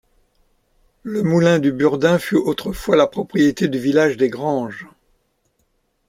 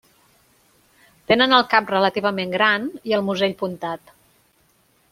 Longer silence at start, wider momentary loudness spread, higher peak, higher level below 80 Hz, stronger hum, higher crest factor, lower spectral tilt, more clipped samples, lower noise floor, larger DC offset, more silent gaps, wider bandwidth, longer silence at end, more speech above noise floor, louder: second, 1.05 s vs 1.3 s; second, 9 LU vs 13 LU; about the same, -2 dBFS vs 0 dBFS; first, -50 dBFS vs -62 dBFS; neither; second, 16 dB vs 22 dB; first, -6.5 dB/octave vs -5 dB/octave; neither; first, -66 dBFS vs -61 dBFS; neither; neither; about the same, 16 kHz vs 16 kHz; about the same, 1.25 s vs 1.15 s; first, 49 dB vs 41 dB; about the same, -18 LUFS vs -19 LUFS